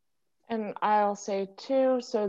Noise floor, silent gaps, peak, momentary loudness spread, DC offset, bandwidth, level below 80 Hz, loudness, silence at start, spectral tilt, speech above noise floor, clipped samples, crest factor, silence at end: -65 dBFS; none; -14 dBFS; 9 LU; under 0.1%; 7.8 kHz; -80 dBFS; -28 LUFS; 0.5 s; -5 dB/octave; 38 dB; under 0.1%; 16 dB; 0 s